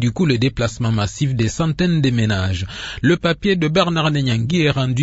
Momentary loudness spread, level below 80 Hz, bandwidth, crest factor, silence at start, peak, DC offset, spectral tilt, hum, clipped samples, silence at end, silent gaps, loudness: 4 LU; -40 dBFS; 8 kHz; 16 dB; 0 s; -2 dBFS; under 0.1%; -6 dB/octave; none; under 0.1%; 0 s; none; -18 LUFS